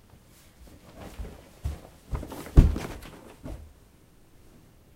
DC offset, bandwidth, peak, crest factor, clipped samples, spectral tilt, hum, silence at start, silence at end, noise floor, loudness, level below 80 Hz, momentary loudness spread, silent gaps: under 0.1%; 15.5 kHz; 0 dBFS; 30 dB; under 0.1%; -7.5 dB/octave; none; 0.95 s; 1.4 s; -56 dBFS; -28 LUFS; -30 dBFS; 25 LU; none